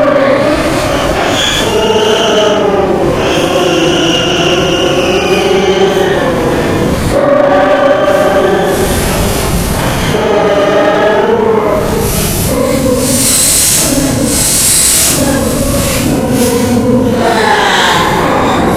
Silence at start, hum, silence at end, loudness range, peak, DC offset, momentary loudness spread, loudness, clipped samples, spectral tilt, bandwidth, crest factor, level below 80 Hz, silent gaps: 0 s; none; 0 s; 3 LU; 0 dBFS; under 0.1%; 5 LU; -9 LUFS; 0.3%; -3.5 dB/octave; over 20 kHz; 10 dB; -26 dBFS; none